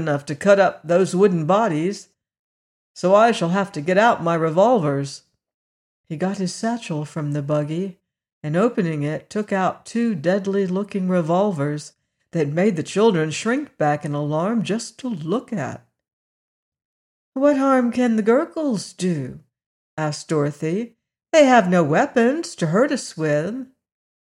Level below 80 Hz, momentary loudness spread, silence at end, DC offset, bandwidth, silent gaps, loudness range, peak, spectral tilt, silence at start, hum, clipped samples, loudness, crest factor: -68 dBFS; 12 LU; 0.65 s; under 0.1%; 11.5 kHz; 2.39-2.95 s, 5.54-6.04 s, 8.33-8.41 s, 16.13-16.72 s, 16.85-17.32 s, 19.66-19.97 s; 6 LU; -4 dBFS; -6 dB/octave; 0 s; none; under 0.1%; -20 LUFS; 18 dB